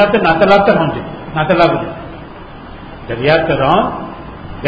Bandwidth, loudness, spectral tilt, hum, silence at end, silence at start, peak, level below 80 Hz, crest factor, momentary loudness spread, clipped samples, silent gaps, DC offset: 7.6 kHz; -13 LUFS; -7.5 dB/octave; none; 0 s; 0 s; 0 dBFS; -36 dBFS; 14 dB; 22 LU; under 0.1%; none; under 0.1%